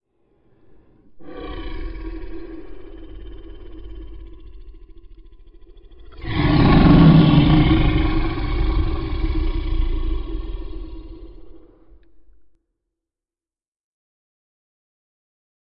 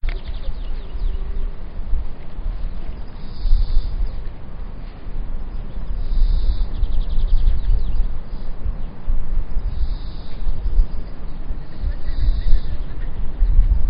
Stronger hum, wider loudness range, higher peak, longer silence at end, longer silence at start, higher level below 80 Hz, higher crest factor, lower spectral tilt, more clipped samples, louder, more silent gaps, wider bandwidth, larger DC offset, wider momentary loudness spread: neither; first, 23 LU vs 4 LU; about the same, -2 dBFS vs 0 dBFS; first, 4.15 s vs 0 s; first, 1.15 s vs 0.05 s; second, -26 dBFS vs -18 dBFS; about the same, 18 dB vs 16 dB; about the same, -12 dB/octave vs -11 dB/octave; neither; first, -17 LUFS vs -28 LUFS; neither; about the same, 5.6 kHz vs 5.2 kHz; neither; first, 28 LU vs 12 LU